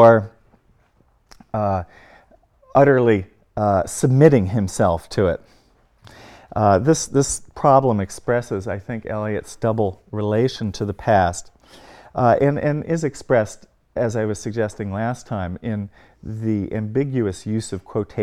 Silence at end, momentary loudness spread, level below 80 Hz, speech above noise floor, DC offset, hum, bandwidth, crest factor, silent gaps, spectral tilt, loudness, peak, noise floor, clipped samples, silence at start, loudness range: 0 s; 13 LU; -48 dBFS; 40 dB; under 0.1%; none; 14 kHz; 20 dB; none; -6.5 dB/octave; -20 LUFS; 0 dBFS; -59 dBFS; under 0.1%; 0 s; 7 LU